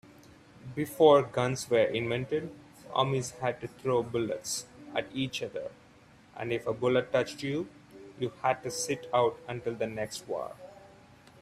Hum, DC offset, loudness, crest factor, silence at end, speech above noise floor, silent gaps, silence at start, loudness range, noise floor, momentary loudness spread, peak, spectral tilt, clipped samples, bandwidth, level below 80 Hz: none; under 0.1%; -30 LUFS; 22 dB; 0.55 s; 28 dB; none; 0.65 s; 6 LU; -57 dBFS; 15 LU; -8 dBFS; -4.5 dB/octave; under 0.1%; 15.5 kHz; -66 dBFS